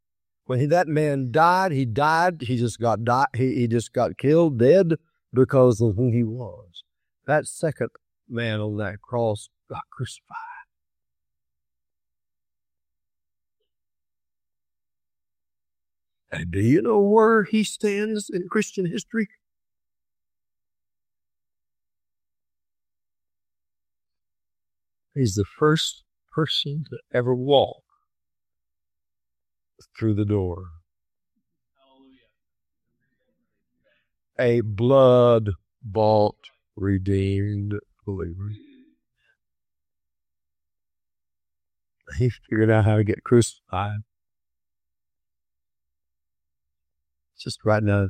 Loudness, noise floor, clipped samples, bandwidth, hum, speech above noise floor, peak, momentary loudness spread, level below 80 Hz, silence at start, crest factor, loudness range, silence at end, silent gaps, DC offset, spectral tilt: -22 LUFS; under -90 dBFS; under 0.1%; 14 kHz; none; over 69 dB; -4 dBFS; 17 LU; -58 dBFS; 0.5 s; 20 dB; 14 LU; 0 s; none; under 0.1%; -6.5 dB/octave